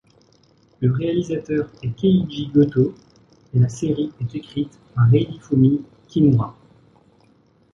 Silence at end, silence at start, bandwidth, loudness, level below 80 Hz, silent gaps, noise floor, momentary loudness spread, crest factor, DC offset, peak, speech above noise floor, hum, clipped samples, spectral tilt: 1.25 s; 0.8 s; 7.6 kHz; -20 LUFS; -50 dBFS; none; -57 dBFS; 11 LU; 16 dB; under 0.1%; -4 dBFS; 38 dB; none; under 0.1%; -8.5 dB/octave